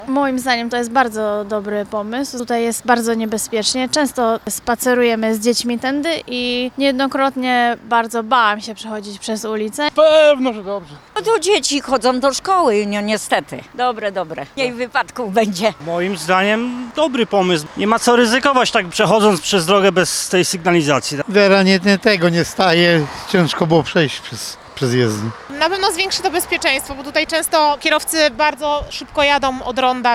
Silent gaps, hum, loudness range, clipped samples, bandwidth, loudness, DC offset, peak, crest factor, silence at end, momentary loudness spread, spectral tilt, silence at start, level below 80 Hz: none; none; 5 LU; under 0.1%; 16.5 kHz; -16 LUFS; under 0.1%; 0 dBFS; 16 dB; 0 s; 9 LU; -4 dB/octave; 0 s; -48 dBFS